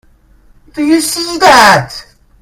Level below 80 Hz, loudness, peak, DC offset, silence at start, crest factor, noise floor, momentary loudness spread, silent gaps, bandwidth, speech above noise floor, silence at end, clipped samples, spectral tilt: -42 dBFS; -8 LUFS; 0 dBFS; under 0.1%; 0.75 s; 12 dB; -44 dBFS; 22 LU; none; over 20 kHz; 36 dB; 0.4 s; 2%; -3 dB/octave